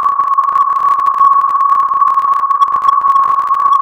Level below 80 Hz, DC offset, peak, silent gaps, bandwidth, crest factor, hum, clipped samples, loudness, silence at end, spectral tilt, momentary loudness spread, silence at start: -56 dBFS; under 0.1%; 0 dBFS; none; 8.2 kHz; 10 dB; none; under 0.1%; -10 LUFS; 0 s; -2.5 dB/octave; 3 LU; 0 s